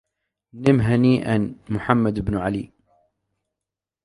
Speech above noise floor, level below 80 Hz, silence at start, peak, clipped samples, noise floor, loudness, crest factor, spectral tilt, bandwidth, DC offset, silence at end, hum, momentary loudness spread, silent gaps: 67 dB; -46 dBFS; 0.55 s; 0 dBFS; under 0.1%; -87 dBFS; -21 LUFS; 22 dB; -8.5 dB/octave; 11.5 kHz; under 0.1%; 1.4 s; none; 10 LU; none